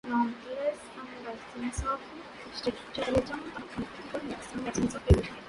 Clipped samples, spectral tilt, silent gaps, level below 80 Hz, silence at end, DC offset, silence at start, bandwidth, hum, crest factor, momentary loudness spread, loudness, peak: under 0.1%; -6 dB/octave; none; -40 dBFS; 0 s; under 0.1%; 0.05 s; 11.5 kHz; none; 24 dB; 13 LU; -33 LUFS; -8 dBFS